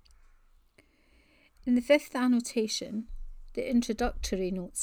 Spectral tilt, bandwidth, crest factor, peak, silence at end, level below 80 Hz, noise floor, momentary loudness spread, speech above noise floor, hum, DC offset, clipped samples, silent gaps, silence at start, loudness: -4 dB/octave; 17.5 kHz; 20 dB; -10 dBFS; 0 s; -46 dBFS; -64 dBFS; 15 LU; 35 dB; none; under 0.1%; under 0.1%; none; 1.65 s; -30 LUFS